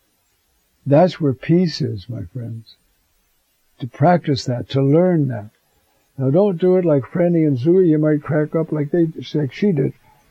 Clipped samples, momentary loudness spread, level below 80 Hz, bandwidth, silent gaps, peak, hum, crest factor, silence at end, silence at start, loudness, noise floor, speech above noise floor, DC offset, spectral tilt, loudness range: under 0.1%; 15 LU; -58 dBFS; 7.8 kHz; none; -2 dBFS; none; 16 dB; 0.4 s; 0.85 s; -17 LUFS; -64 dBFS; 47 dB; under 0.1%; -8.5 dB/octave; 5 LU